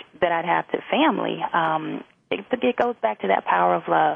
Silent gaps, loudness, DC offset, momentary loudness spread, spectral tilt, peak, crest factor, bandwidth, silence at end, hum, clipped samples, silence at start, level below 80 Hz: none; -22 LUFS; under 0.1%; 8 LU; -7.5 dB/octave; -6 dBFS; 16 dB; 5.2 kHz; 0 s; none; under 0.1%; 0.2 s; -64 dBFS